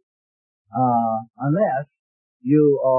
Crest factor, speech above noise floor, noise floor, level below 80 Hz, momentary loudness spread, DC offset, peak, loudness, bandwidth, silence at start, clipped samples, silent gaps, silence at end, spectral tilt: 14 dB; over 72 dB; under -90 dBFS; -68 dBFS; 14 LU; under 0.1%; -6 dBFS; -21 LUFS; 3 kHz; 0.75 s; under 0.1%; 1.99-2.40 s; 0 s; -14.5 dB/octave